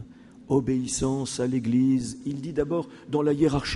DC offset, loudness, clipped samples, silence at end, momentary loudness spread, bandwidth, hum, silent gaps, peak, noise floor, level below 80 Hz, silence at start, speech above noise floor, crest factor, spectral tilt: under 0.1%; -26 LUFS; under 0.1%; 0 s; 8 LU; 11.5 kHz; none; none; -10 dBFS; -45 dBFS; -48 dBFS; 0 s; 20 dB; 16 dB; -5.5 dB/octave